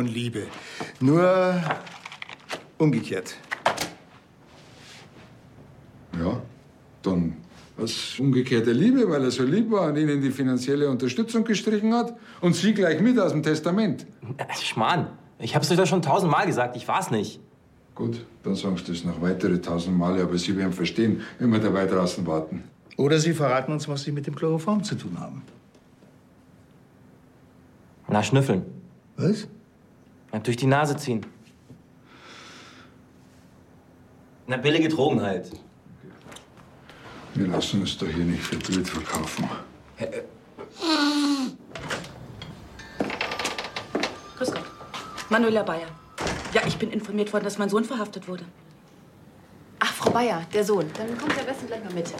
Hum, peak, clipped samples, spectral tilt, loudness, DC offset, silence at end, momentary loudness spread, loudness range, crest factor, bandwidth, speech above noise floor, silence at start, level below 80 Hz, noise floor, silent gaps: none; -6 dBFS; under 0.1%; -5.5 dB/octave; -25 LUFS; under 0.1%; 0 s; 18 LU; 8 LU; 20 dB; 16 kHz; 31 dB; 0 s; -56 dBFS; -55 dBFS; none